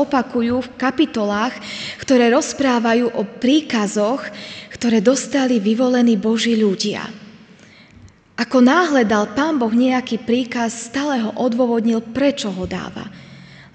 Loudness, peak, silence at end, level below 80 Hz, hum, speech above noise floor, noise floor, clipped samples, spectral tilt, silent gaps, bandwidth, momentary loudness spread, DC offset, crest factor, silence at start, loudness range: -18 LUFS; 0 dBFS; 0.15 s; -54 dBFS; none; 28 dB; -46 dBFS; under 0.1%; -4.5 dB/octave; none; 9 kHz; 12 LU; under 0.1%; 18 dB; 0 s; 2 LU